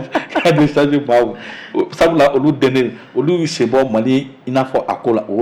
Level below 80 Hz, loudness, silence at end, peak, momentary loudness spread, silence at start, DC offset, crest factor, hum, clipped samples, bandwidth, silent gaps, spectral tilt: -48 dBFS; -15 LUFS; 0 s; -4 dBFS; 7 LU; 0 s; under 0.1%; 10 dB; none; under 0.1%; 15 kHz; none; -6.5 dB/octave